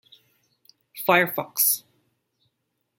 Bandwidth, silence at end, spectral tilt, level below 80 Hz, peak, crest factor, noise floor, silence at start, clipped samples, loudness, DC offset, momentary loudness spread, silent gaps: 16.5 kHz; 1.2 s; -2.5 dB/octave; -80 dBFS; -2 dBFS; 26 dB; -77 dBFS; 0.95 s; under 0.1%; -22 LUFS; under 0.1%; 9 LU; none